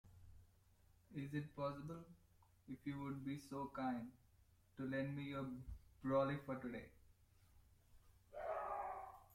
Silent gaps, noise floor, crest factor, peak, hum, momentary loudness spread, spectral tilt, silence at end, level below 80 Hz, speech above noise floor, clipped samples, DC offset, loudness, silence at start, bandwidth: none; -73 dBFS; 22 dB; -28 dBFS; none; 16 LU; -7.5 dB/octave; 0 s; -68 dBFS; 27 dB; under 0.1%; under 0.1%; -47 LUFS; 0.05 s; 16.5 kHz